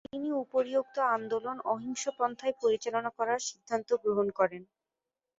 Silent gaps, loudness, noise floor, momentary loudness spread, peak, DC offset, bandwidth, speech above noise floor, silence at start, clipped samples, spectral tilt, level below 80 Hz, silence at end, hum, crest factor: none; -32 LUFS; -90 dBFS; 5 LU; -14 dBFS; under 0.1%; 8 kHz; 58 dB; 0.15 s; under 0.1%; -3.5 dB/octave; -76 dBFS; 0.75 s; none; 18 dB